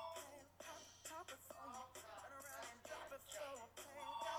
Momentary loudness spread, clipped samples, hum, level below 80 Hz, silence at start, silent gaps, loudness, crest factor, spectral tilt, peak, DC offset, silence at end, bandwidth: 5 LU; under 0.1%; none; -82 dBFS; 0 s; none; -54 LUFS; 18 dB; -1.5 dB/octave; -36 dBFS; under 0.1%; 0 s; over 20 kHz